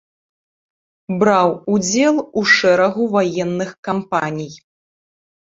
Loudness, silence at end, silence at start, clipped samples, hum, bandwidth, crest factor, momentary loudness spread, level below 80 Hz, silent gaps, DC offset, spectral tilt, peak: -16 LUFS; 1.05 s; 1.1 s; under 0.1%; none; 7.8 kHz; 18 dB; 12 LU; -60 dBFS; 3.78-3.83 s; under 0.1%; -4.5 dB/octave; -2 dBFS